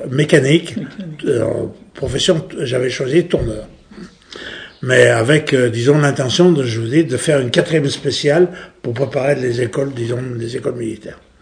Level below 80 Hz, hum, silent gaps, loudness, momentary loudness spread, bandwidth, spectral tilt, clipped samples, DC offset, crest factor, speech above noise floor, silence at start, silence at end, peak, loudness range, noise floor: -42 dBFS; none; none; -16 LUFS; 15 LU; 10 kHz; -5.5 dB/octave; under 0.1%; under 0.1%; 16 dB; 22 dB; 0 s; 0.25 s; 0 dBFS; 5 LU; -38 dBFS